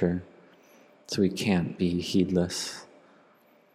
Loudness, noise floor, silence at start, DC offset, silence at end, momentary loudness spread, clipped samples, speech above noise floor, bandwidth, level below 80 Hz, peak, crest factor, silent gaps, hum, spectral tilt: -28 LUFS; -61 dBFS; 0 s; under 0.1%; 0.9 s; 10 LU; under 0.1%; 34 dB; 15 kHz; -64 dBFS; -12 dBFS; 18 dB; none; none; -5.5 dB/octave